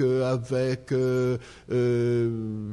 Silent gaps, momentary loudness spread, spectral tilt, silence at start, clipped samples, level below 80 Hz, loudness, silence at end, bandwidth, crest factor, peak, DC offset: none; 6 LU; -8 dB/octave; 0 s; under 0.1%; -56 dBFS; -26 LUFS; 0 s; 12 kHz; 12 dB; -14 dBFS; under 0.1%